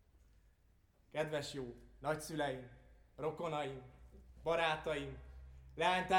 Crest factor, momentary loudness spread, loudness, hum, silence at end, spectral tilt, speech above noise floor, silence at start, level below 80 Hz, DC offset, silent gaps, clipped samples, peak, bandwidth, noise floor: 20 dB; 20 LU; -40 LUFS; none; 0 s; -4.5 dB/octave; 32 dB; 1.15 s; -60 dBFS; under 0.1%; none; under 0.1%; -20 dBFS; 17.5 kHz; -71 dBFS